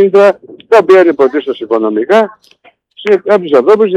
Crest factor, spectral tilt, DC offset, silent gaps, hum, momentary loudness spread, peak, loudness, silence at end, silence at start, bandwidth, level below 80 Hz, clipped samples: 10 dB; -6 dB/octave; under 0.1%; none; none; 10 LU; 0 dBFS; -9 LUFS; 0 s; 0 s; 9 kHz; -62 dBFS; 0.3%